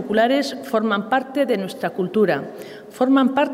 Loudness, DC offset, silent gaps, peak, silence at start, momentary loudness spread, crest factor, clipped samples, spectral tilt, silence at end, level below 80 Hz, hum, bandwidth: -20 LUFS; under 0.1%; none; -6 dBFS; 0 s; 9 LU; 14 dB; under 0.1%; -5.5 dB/octave; 0 s; -66 dBFS; none; 16 kHz